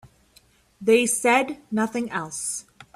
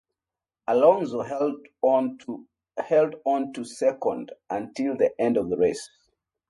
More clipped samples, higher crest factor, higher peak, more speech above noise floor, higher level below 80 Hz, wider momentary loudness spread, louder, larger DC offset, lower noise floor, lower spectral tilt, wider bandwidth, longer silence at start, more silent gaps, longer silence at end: neither; about the same, 18 dB vs 20 dB; about the same, -6 dBFS vs -6 dBFS; second, 36 dB vs over 66 dB; about the same, -64 dBFS vs -66 dBFS; second, 10 LU vs 17 LU; about the same, -23 LUFS vs -25 LUFS; neither; second, -58 dBFS vs under -90 dBFS; second, -3 dB/octave vs -6 dB/octave; first, 15.5 kHz vs 11.5 kHz; second, 0.05 s vs 0.7 s; neither; second, 0.1 s vs 0.65 s